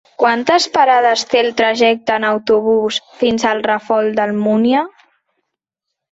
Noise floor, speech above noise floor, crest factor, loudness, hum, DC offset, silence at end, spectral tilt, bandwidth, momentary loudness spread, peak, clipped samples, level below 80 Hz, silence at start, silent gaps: -79 dBFS; 65 dB; 16 dB; -14 LUFS; none; under 0.1%; 1.25 s; -4 dB/octave; 8 kHz; 6 LU; 0 dBFS; under 0.1%; -58 dBFS; 0.2 s; none